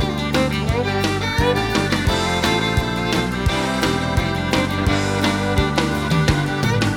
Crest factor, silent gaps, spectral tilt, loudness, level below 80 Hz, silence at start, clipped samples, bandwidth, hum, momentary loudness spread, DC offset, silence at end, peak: 16 dB; none; -5 dB/octave; -19 LUFS; -30 dBFS; 0 s; under 0.1%; 18 kHz; none; 2 LU; under 0.1%; 0 s; -2 dBFS